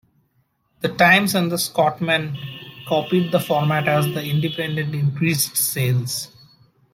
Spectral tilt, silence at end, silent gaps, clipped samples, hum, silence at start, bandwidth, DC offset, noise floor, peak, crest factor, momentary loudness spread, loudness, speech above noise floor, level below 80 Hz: -4.5 dB/octave; 0.65 s; none; under 0.1%; none; 0.8 s; 16.5 kHz; under 0.1%; -66 dBFS; -2 dBFS; 20 dB; 12 LU; -20 LUFS; 46 dB; -60 dBFS